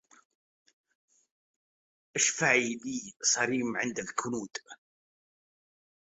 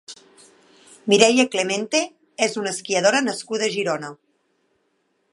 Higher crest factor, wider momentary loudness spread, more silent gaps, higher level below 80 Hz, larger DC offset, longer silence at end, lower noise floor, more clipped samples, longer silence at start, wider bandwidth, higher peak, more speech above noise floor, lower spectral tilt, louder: about the same, 24 dB vs 22 dB; second, 12 LU vs 15 LU; neither; about the same, -76 dBFS vs -74 dBFS; neither; about the same, 1.25 s vs 1.2 s; first, under -90 dBFS vs -69 dBFS; neither; first, 2.15 s vs 0.1 s; second, 8.2 kHz vs 11.5 kHz; second, -10 dBFS vs 0 dBFS; first, over 59 dB vs 49 dB; about the same, -2 dB/octave vs -2.5 dB/octave; second, -29 LUFS vs -20 LUFS